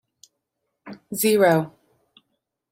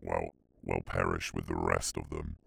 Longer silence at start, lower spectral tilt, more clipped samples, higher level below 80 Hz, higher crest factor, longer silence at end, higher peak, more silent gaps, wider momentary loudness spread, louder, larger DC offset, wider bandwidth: first, 0.85 s vs 0 s; about the same, -4.5 dB/octave vs -4.5 dB/octave; neither; second, -72 dBFS vs -46 dBFS; about the same, 20 dB vs 22 dB; first, 1.05 s vs 0.1 s; first, -6 dBFS vs -12 dBFS; neither; first, 26 LU vs 10 LU; first, -20 LUFS vs -35 LUFS; neither; second, 16.5 kHz vs over 20 kHz